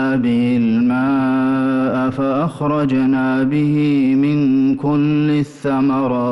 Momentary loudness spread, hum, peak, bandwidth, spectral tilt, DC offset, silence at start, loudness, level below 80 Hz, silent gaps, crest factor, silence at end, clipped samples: 3 LU; none; -8 dBFS; 10.5 kHz; -8.5 dB/octave; under 0.1%; 0 s; -16 LUFS; -52 dBFS; none; 6 dB; 0 s; under 0.1%